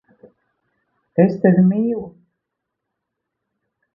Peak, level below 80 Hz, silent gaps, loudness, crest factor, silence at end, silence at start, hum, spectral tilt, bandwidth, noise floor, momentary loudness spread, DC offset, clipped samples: -2 dBFS; -60 dBFS; none; -17 LUFS; 20 dB; 1.85 s; 1.15 s; none; -12 dB/octave; 2.8 kHz; -79 dBFS; 13 LU; under 0.1%; under 0.1%